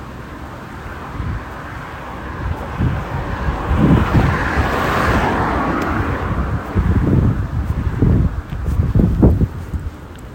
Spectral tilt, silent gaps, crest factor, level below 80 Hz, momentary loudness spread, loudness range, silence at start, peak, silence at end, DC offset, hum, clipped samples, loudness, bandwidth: -8 dB/octave; none; 18 dB; -24 dBFS; 15 LU; 7 LU; 0 s; 0 dBFS; 0 s; under 0.1%; none; under 0.1%; -18 LUFS; 16.5 kHz